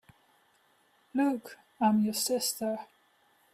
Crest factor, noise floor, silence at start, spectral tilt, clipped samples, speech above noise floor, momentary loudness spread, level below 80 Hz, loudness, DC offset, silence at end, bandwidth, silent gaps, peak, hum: 18 dB; -68 dBFS; 1.15 s; -4 dB/octave; under 0.1%; 39 dB; 12 LU; -78 dBFS; -30 LUFS; under 0.1%; 0.7 s; 16 kHz; none; -14 dBFS; none